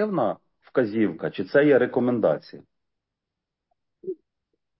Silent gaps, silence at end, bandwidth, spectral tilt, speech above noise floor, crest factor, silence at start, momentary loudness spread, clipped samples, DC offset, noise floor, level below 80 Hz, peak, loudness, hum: none; 0.65 s; 5.8 kHz; -11 dB/octave; 63 dB; 18 dB; 0 s; 19 LU; under 0.1%; under 0.1%; -85 dBFS; -68 dBFS; -8 dBFS; -23 LUFS; none